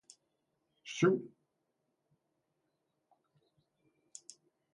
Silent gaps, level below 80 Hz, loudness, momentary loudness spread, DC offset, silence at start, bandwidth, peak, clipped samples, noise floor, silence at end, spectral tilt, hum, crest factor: none; -88 dBFS; -33 LUFS; 24 LU; under 0.1%; 0.85 s; 11.5 kHz; -18 dBFS; under 0.1%; -83 dBFS; 3.5 s; -5.5 dB/octave; none; 24 dB